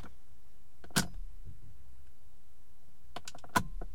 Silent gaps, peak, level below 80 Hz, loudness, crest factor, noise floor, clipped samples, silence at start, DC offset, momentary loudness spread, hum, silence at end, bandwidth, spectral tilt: none; -10 dBFS; -50 dBFS; -36 LUFS; 30 dB; -63 dBFS; under 0.1%; 0 s; 2%; 25 LU; none; 0 s; 16.5 kHz; -3 dB/octave